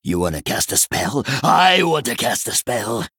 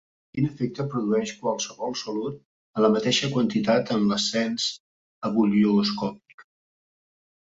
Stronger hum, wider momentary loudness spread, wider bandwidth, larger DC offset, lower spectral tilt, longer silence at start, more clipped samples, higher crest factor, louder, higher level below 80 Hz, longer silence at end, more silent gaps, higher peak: neither; second, 8 LU vs 12 LU; first, over 20 kHz vs 7.8 kHz; neither; second, -3 dB/octave vs -5 dB/octave; second, 0.05 s vs 0.35 s; neither; about the same, 18 dB vs 20 dB; first, -17 LUFS vs -25 LUFS; first, -48 dBFS vs -62 dBFS; second, 0.1 s vs 1.15 s; second, none vs 2.45-2.74 s, 4.80-5.21 s, 6.34-6.38 s; first, 0 dBFS vs -6 dBFS